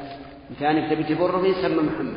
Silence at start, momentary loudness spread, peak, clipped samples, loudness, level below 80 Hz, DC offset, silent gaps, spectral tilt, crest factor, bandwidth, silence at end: 0 s; 18 LU; -8 dBFS; under 0.1%; -22 LUFS; -52 dBFS; under 0.1%; none; -5 dB/octave; 16 dB; 5.4 kHz; 0 s